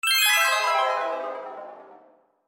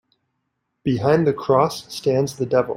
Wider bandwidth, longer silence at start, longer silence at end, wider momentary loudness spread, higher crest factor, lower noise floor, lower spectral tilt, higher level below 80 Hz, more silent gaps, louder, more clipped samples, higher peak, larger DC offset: about the same, 16.5 kHz vs 16 kHz; second, 0.05 s vs 0.85 s; first, 0.5 s vs 0 s; first, 21 LU vs 7 LU; about the same, 16 dB vs 18 dB; second, -57 dBFS vs -75 dBFS; second, 3.5 dB/octave vs -6.5 dB/octave; second, under -90 dBFS vs -56 dBFS; neither; about the same, -21 LUFS vs -20 LUFS; neither; second, -8 dBFS vs -4 dBFS; neither